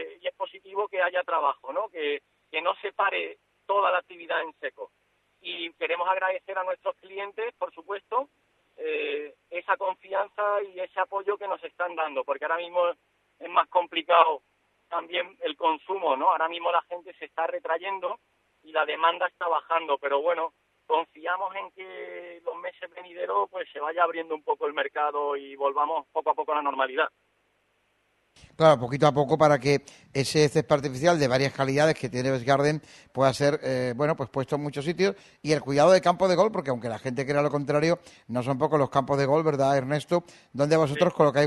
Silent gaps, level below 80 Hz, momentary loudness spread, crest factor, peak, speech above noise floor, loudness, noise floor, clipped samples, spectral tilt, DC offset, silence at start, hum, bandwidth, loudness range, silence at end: none; -66 dBFS; 14 LU; 22 dB; -4 dBFS; 44 dB; -26 LUFS; -70 dBFS; under 0.1%; -5.5 dB/octave; under 0.1%; 0 s; 50 Hz at -60 dBFS; 12 kHz; 7 LU; 0 s